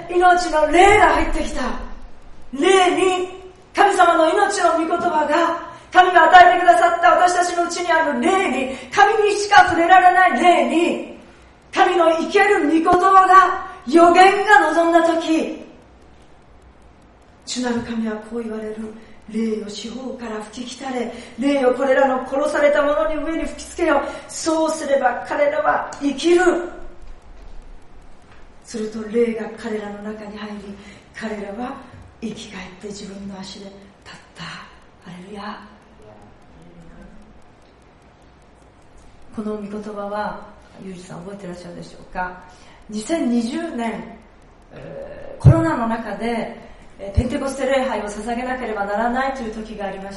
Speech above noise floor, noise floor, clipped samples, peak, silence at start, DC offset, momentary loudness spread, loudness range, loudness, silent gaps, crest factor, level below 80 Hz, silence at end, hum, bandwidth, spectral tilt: 31 dB; -49 dBFS; under 0.1%; 0 dBFS; 0 s; under 0.1%; 21 LU; 18 LU; -17 LUFS; none; 18 dB; -40 dBFS; 0 s; none; 11.5 kHz; -5 dB/octave